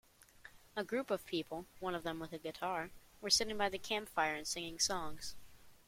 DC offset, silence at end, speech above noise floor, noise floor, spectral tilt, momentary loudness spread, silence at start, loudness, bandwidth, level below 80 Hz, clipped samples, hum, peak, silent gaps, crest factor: under 0.1%; 0.1 s; 22 dB; -61 dBFS; -2 dB/octave; 15 LU; 0.35 s; -38 LUFS; 16.5 kHz; -64 dBFS; under 0.1%; none; -16 dBFS; none; 24 dB